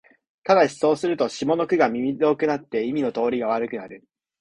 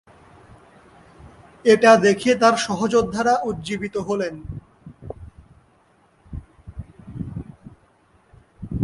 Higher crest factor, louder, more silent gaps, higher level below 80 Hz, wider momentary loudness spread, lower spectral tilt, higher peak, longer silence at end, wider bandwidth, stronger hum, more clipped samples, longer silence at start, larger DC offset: about the same, 20 dB vs 22 dB; second, -22 LUFS vs -19 LUFS; neither; second, -64 dBFS vs -46 dBFS; second, 9 LU vs 25 LU; about the same, -5.5 dB/octave vs -5 dB/octave; second, -4 dBFS vs 0 dBFS; first, 0.45 s vs 0 s; about the same, 11 kHz vs 11.5 kHz; neither; neither; second, 0.45 s vs 1.25 s; neither